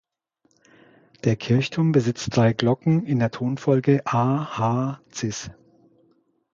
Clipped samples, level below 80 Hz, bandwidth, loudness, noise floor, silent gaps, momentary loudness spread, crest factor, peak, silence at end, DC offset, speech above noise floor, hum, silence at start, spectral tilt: under 0.1%; -56 dBFS; 7.6 kHz; -22 LUFS; -68 dBFS; none; 9 LU; 20 dB; -4 dBFS; 1 s; under 0.1%; 47 dB; none; 1.25 s; -6.5 dB/octave